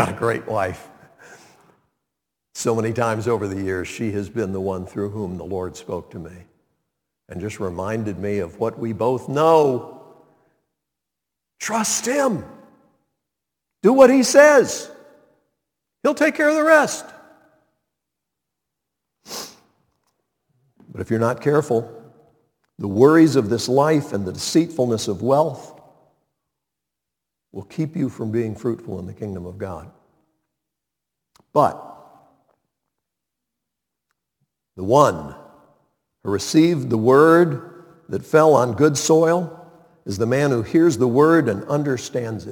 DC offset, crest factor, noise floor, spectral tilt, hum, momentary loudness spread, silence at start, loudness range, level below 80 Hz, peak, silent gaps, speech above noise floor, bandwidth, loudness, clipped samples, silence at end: under 0.1%; 22 dB; -84 dBFS; -5.5 dB/octave; none; 19 LU; 0 s; 12 LU; -60 dBFS; 0 dBFS; none; 65 dB; 19 kHz; -19 LUFS; under 0.1%; 0 s